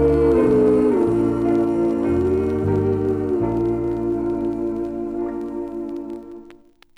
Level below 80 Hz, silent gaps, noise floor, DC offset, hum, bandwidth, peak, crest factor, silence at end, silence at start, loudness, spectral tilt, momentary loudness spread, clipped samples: -38 dBFS; none; -48 dBFS; under 0.1%; none; 10 kHz; -6 dBFS; 14 dB; 0.4 s; 0 s; -20 LUFS; -9.5 dB/octave; 13 LU; under 0.1%